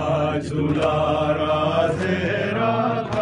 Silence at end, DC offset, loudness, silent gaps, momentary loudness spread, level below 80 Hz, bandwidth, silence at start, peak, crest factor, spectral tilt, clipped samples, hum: 0 s; under 0.1%; -21 LUFS; none; 3 LU; -44 dBFS; 10.5 kHz; 0 s; -8 dBFS; 14 dB; -7 dB/octave; under 0.1%; none